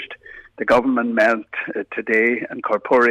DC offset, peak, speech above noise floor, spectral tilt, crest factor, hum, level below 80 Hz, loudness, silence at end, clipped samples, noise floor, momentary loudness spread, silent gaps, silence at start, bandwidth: under 0.1%; -6 dBFS; 22 dB; -5.5 dB/octave; 14 dB; none; -58 dBFS; -19 LUFS; 0 s; under 0.1%; -40 dBFS; 10 LU; none; 0 s; 12 kHz